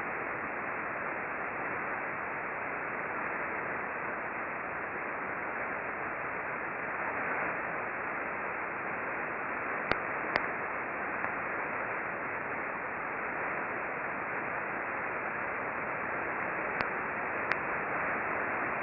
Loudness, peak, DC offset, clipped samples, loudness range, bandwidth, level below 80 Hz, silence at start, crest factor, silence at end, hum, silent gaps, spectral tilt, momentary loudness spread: -34 LUFS; -10 dBFS; under 0.1%; under 0.1%; 2 LU; 5 kHz; -66 dBFS; 0 s; 26 dB; 0 s; none; none; -3.5 dB/octave; 3 LU